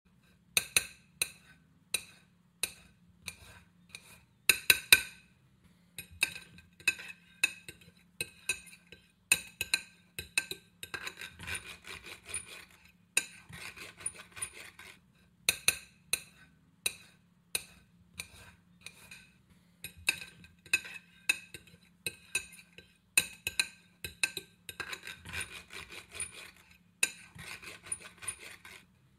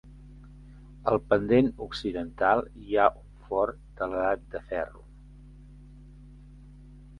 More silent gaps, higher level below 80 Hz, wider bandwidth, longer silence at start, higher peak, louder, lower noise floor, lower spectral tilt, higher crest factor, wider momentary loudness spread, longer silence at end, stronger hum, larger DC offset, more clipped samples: neither; second, -66 dBFS vs -50 dBFS; first, 16 kHz vs 10.5 kHz; first, 0.55 s vs 0.05 s; first, -2 dBFS vs -6 dBFS; second, -33 LUFS vs -28 LUFS; first, -65 dBFS vs -49 dBFS; second, 0.5 dB/octave vs -7.5 dB/octave; first, 38 dB vs 24 dB; first, 21 LU vs 10 LU; first, 0.4 s vs 0 s; neither; neither; neither